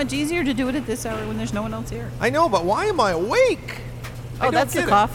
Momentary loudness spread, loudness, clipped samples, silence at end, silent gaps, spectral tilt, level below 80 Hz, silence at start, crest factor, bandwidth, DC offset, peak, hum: 13 LU; -22 LUFS; under 0.1%; 0 s; none; -5 dB/octave; -40 dBFS; 0 s; 16 dB; 18 kHz; under 0.1%; -6 dBFS; none